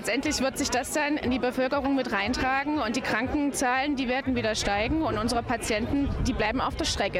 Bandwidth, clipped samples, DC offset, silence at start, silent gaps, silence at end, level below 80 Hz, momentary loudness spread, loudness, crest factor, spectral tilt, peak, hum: 16 kHz; under 0.1%; under 0.1%; 0 s; none; 0 s; -40 dBFS; 2 LU; -27 LUFS; 14 dB; -4 dB/octave; -14 dBFS; none